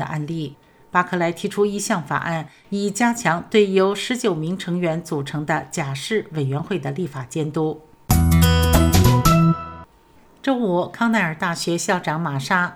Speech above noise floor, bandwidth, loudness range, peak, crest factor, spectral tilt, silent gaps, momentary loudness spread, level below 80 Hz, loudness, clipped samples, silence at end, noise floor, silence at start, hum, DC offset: 30 dB; 18.5 kHz; 6 LU; -2 dBFS; 18 dB; -5.5 dB/octave; none; 11 LU; -32 dBFS; -20 LUFS; under 0.1%; 0 s; -51 dBFS; 0 s; none; under 0.1%